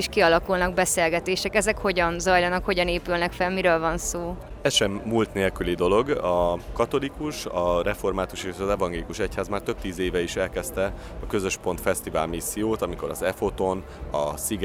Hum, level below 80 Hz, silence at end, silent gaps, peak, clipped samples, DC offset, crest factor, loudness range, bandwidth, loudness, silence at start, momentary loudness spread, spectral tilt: none; -40 dBFS; 0 s; none; -6 dBFS; under 0.1%; under 0.1%; 20 dB; 5 LU; over 20 kHz; -25 LUFS; 0 s; 8 LU; -4 dB/octave